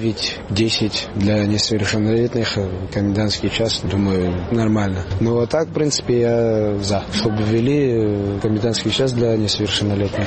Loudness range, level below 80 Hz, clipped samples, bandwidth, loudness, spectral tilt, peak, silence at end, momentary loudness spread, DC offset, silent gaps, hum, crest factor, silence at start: 1 LU; -40 dBFS; under 0.1%; 8.8 kHz; -19 LUFS; -5.5 dB/octave; -6 dBFS; 0 s; 4 LU; 0.2%; none; none; 12 dB; 0 s